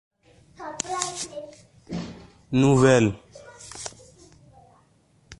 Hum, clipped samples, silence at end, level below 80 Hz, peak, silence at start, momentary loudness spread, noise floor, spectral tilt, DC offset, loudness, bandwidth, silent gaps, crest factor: none; under 0.1%; 0.05 s; -54 dBFS; -4 dBFS; 0.6 s; 23 LU; -61 dBFS; -5.5 dB/octave; under 0.1%; -23 LUFS; 11.5 kHz; none; 24 dB